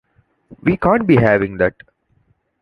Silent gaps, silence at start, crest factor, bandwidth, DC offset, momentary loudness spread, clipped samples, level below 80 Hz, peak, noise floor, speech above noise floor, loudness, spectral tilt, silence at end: none; 0.5 s; 16 dB; 10 kHz; under 0.1%; 7 LU; under 0.1%; -42 dBFS; 0 dBFS; -61 dBFS; 46 dB; -16 LUFS; -9.5 dB/octave; 0.9 s